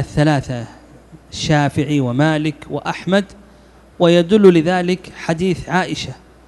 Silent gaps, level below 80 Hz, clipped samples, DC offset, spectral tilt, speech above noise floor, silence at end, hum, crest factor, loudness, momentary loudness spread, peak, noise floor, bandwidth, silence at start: none; -44 dBFS; 0.1%; under 0.1%; -6.5 dB/octave; 30 dB; 0.3 s; none; 16 dB; -16 LUFS; 16 LU; 0 dBFS; -45 dBFS; 12 kHz; 0 s